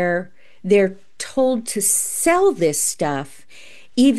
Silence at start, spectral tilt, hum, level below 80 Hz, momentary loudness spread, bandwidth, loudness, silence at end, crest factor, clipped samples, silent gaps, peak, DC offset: 0 s; -3.5 dB/octave; none; -56 dBFS; 12 LU; 13 kHz; -19 LUFS; 0 s; 16 dB; under 0.1%; none; -4 dBFS; 1%